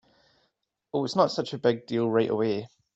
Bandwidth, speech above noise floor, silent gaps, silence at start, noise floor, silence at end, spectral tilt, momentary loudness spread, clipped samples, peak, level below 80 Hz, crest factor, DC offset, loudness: 8 kHz; 50 dB; none; 0.95 s; -75 dBFS; 0.3 s; -6 dB/octave; 7 LU; under 0.1%; -8 dBFS; -70 dBFS; 20 dB; under 0.1%; -27 LUFS